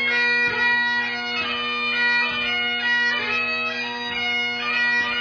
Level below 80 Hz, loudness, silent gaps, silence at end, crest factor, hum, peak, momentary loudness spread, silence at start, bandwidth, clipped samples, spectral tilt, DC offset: -60 dBFS; -20 LUFS; none; 0 s; 12 dB; none; -10 dBFS; 5 LU; 0 s; 5.4 kHz; under 0.1%; -2 dB/octave; under 0.1%